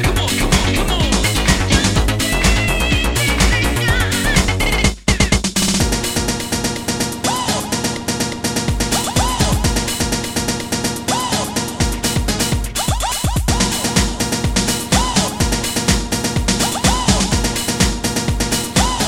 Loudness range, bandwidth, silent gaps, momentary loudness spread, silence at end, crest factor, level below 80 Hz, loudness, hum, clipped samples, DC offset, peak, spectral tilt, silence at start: 3 LU; 17 kHz; none; 5 LU; 0 s; 16 dB; -24 dBFS; -16 LUFS; none; under 0.1%; 0.3%; 0 dBFS; -3.5 dB/octave; 0 s